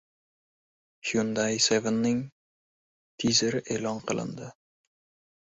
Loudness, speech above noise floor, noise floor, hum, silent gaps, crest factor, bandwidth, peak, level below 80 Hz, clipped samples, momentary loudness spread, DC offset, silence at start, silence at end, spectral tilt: -27 LUFS; over 63 dB; under -90 dBFS; none; 2.32-3.18 s; 20 dB; 8 kHz; -10 dBFS; -64 dBFS; under 0.1%; 14 LU; under 0.1%; 1.05 s; 0.9 s; -3.5 dB/octave